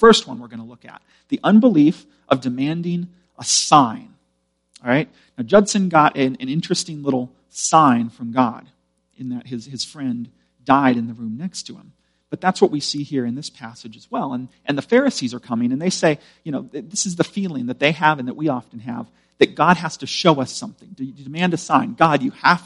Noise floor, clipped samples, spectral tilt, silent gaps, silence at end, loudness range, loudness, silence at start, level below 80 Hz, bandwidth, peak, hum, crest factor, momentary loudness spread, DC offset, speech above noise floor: -69 dBFS; under 0.1%; -4.5 dB/octave; none; 0.05 s; 6 LU; -19 LUFS; 0 s; -58 dBFS; 11.5 kHz; 0 dBFS; none; 20 dB; 18 LU; under 0.1%; 50 dB